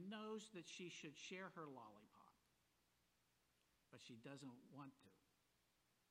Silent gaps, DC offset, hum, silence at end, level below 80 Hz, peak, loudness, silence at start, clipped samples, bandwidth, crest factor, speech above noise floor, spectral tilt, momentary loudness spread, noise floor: none; under 0.1%; 60 Hz at -95 dBFS; 0.9 s; under -90 dBFS; -42 dBFS; -57 LUFS; 0 s; under 0.1%; 12.5 kHz; 18 dB; 25 dB; -4 dB/octave; 10 LU; -84 dBFS